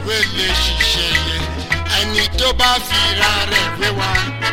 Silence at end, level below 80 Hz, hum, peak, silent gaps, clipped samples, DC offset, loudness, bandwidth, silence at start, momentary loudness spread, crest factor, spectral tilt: 0 s; -28 dBFS; none; 0 dBFS; none; under 0.1%; under 0.1%; -15 LUFS; 16.5 kHz; 0 s; 5 LU; 16 dB; -2.5 dB/octave